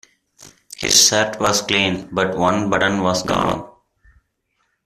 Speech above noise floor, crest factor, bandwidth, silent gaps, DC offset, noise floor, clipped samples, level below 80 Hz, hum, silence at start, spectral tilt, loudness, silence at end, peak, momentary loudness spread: 51 dB; 20 dB; 15.5 kHz; none; under 0.1%; -69 dBFS; under 0.1%; -48 dBFS; none; 0.4 s; -2.5 dB/octave; -17 LUFS; 1.15 s; 0 dBFS; 11 LU